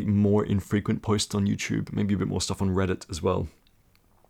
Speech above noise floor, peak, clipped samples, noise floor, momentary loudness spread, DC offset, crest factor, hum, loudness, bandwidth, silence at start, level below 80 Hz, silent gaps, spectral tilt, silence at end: 36 dB; -14 dBFS; under 0.1%; -61 dBFS; 6 LU; under 0.1%; 14 dB; none; -27 LUFS; 14 kHz; 0 s; -48 dBFS; none; -6 dB/octave; 0.8 s